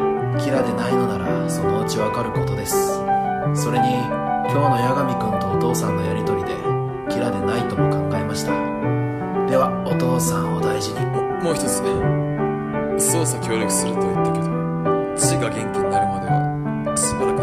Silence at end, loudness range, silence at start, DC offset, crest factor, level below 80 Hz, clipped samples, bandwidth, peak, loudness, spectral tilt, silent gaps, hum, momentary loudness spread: 0 s; 1 LU; 0 s; under 0.1%; 16 dB; -44 dBFS; under 0.1%; 14.5 kHz; -4 dBFS; -21 LUFS; -5.5 dB/octave; none; none; 4 LU